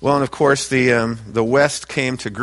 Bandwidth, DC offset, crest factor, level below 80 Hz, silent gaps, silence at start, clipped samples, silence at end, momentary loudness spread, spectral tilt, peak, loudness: 11.5 kHz; under 0.1%; 18 dB; -48 dBFS; none; 0 s; under 0.1%; 0 s; 6 LU; -4.5 dB/octave; 0 dBFS; -18 LUFS